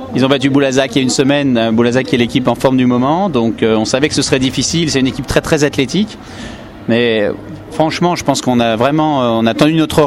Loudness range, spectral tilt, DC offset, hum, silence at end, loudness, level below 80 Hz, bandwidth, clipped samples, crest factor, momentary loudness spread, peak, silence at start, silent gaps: 3 LU; -5 dB/octave; under 0.1%; none; 0 s; -13 LUFS; -40 dBFS; 13.5 kHz; under 0.1%; 12 dB; 6 LU; 0 dBFS; 0 s; none